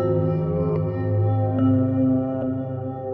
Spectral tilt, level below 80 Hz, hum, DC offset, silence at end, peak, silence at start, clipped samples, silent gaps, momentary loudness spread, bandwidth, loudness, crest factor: -13 dB/octave; -48 dBFS; none; under 0.1%; 0 s; -10 dBFS; 0 s; under 0.1%; none; 7 LU; 3.1 kHz; -22 LUFS; 12 dB